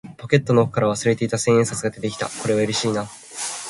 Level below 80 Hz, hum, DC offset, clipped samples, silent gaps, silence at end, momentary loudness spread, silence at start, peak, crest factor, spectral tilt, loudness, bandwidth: -56 dBFS; none; under 0.1%; under 0.1%; none; 0 s; 10 LU; 0.05 s; -2 dBFS; 20 dB; -5 dB/octave; -21 LUFS; 11.5 kHz